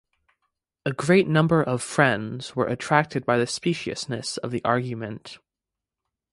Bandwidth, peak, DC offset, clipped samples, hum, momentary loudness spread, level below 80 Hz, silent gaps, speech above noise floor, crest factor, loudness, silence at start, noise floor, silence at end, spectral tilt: 11.5 kHz; -2 dBFS; under 0.1%; under 0.1%; none; 12 LU; -60 dBFS; none; 64 dB; 22 dB; -24 LUFS; 0.85 s; -88 dBFS; 0.95 s; -5.5 dB/octave